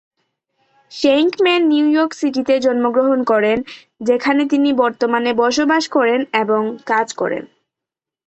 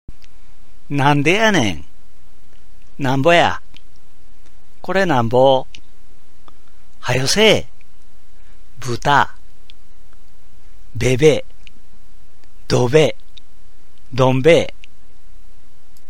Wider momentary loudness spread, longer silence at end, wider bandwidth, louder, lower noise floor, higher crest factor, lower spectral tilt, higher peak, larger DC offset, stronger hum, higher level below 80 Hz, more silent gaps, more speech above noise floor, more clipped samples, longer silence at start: second, 7 LU vs 16 LU; second, 0.8 s vs 1.4 s; second, 8.2 kHz vs 16.5 kHz; about the same, -16 LUFS vs -16 LUFS; first, -86 dBFS vs -50 dBFS; second, 14 dB vs 20 dB; about the same, -4 dB/octave vs -5 dB/octave; about the same, -2 dBFS vs 0 dBFS; second, under 0.1% vs 9%; neither; second, -60 dBFS vs -42 dBFS; neither; first, 70 dB vs 36 dB; neither; about the same, 0.9 s vs 0.9 s